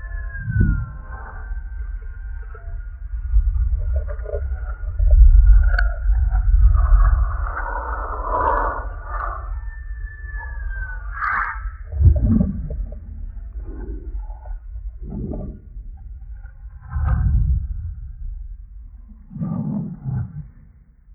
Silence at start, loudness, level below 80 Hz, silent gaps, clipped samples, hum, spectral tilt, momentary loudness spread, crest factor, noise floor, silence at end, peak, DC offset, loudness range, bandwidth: 0 s; -22 LUFS; -20 dBFS; none; under 0.1%; none; -11.5 dB/octave; 19 LU; 18 dB; -48 dBFS; 0 s; -2 dBFS; under 0.1%; 12 LU; 4.6 kHz